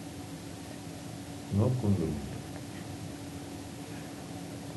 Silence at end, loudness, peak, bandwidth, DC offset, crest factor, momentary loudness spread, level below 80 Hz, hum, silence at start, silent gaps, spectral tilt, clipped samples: 0 s; -36 LUFS; -14 dBFS; 12 kHz; under 0.1%; 20 dB; 13 LU; -54 dBFS; none; 0 s; none; -6.5 dB/octave; under 0.1%